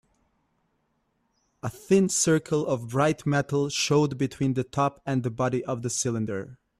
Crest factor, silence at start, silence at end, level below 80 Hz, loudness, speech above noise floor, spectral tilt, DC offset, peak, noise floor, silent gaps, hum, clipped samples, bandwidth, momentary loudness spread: 18 dB; 1.65 s; 0.25 s; -60 dBFS; -26 LUFS; 47 dB; -5 dB/octave; under 0.1%; -10 dBFS; -73 dBFS; none; none; under 0.1%; 14 kHz; 8 LU